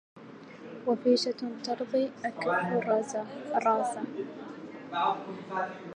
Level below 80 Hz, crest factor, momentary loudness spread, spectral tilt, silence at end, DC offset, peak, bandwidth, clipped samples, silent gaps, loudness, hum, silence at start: -82 dBFS; 18 dB; 17 LU; -4.5 dB/octave; 0 s; under 0.1%; -12 dBFS; 11 kHz; under 0.1%; none; -31 LUFS; none; 0.15 s